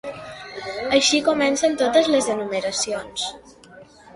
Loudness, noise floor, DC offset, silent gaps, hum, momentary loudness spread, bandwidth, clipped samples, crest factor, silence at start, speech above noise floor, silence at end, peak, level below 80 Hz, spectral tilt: -20 LUFS; -46 dBFS; under 0.1%; none; none; 16 LU; 11.5 kHz; under 0.1%; 18 dB; 0.05 s; 26 dB; 0.3 s; -4 dBFS; -56 dBFS; -2 dB/octave